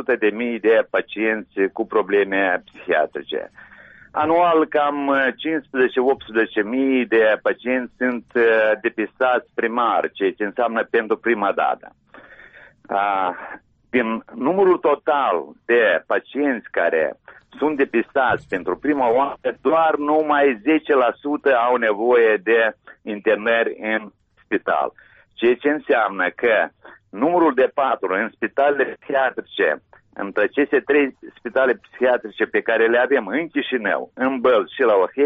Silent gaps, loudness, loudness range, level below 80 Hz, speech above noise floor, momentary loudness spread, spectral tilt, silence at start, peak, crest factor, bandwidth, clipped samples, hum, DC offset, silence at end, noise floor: none; -20 LUFS; 4 LU; -62 dBFS; 27 dB; 8 LU; -2.5 dB/octave; 0 s; -6 dBFS; 14 dB; 4.7 kHz; under 0.1%; none; under 0.1%; 0 s; -46 dBFS